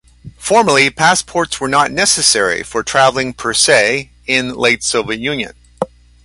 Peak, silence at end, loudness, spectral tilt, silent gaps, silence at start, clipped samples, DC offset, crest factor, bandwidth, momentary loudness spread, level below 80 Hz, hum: 0 dBFS; 0.4 s; -13 LUFS; -2 dB/octave; none; 0.25 s; under 0.1%; under 0.1%; 14 dB; 11.5 kHz; 13 LU; -46 dBFS; none